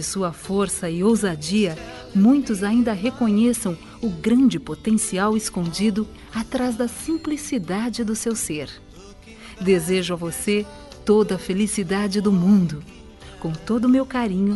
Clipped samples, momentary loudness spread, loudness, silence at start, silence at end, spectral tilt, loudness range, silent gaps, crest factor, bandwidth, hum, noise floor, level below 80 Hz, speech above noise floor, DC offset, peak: under 0.1%; 11 LU; -21 LUFS; 0 s; 0 s; -5.5 dB/octave; 4 LU; none; 14 dB; 12 kHz; none; -43 dBFS; -46 dBFS; 22 dB; under 0.1%; -6 dBFS